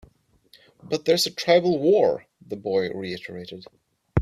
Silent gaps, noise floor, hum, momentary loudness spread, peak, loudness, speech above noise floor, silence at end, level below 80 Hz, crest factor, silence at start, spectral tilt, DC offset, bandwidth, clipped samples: none; -58 dBFS; none; 19 LU; -4 dBFS; -23 LUFS; 35 dB; 0 s; -64 dBFS; 20 dB; 0.85 s; -5 dB/octave; under 0.1%; 15 kHz; under 0.1%